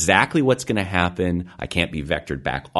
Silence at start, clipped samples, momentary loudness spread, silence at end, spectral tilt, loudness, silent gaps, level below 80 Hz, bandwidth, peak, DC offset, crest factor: 0 s; under 0.1%; 9 LU; 0 s; -4.5 dB/octave; -22 LUFS; none; -42 dBFS; 12 kHz; 0 dBFS; under 0.1%; 22 dB